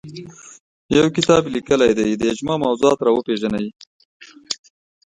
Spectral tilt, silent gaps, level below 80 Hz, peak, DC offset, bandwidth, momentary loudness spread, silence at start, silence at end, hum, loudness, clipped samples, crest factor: -5 dB/octave; 0.60-0.89 s, 3.87-4.20 s; -52 dBFS; 0 dBFS; under 0.1%; 11 kHz; 13 LU; 0.05 s; 0.55 s; none; -18 LUFS; under 0.1%; 18 dB